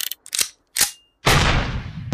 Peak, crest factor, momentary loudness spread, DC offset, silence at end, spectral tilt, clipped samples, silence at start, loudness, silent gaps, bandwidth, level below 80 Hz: -4 dBFS; 18 dB; 8 LU; under 0.1%; 0 s; -2.5 dB/octave; under 0.1%; 0 s; -20 LUFS; none; 15.5 kHz; -30 dBFS